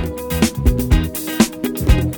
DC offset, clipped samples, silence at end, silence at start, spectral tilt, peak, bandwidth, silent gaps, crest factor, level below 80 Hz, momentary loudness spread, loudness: under 0.1%; under 0.1%; 0 s; 0 s; -5.5 dB/octave; 0 dBFS; 19.5 kHz; none; 16 dB; -20 dBFS; 5 LU; -18 LUFS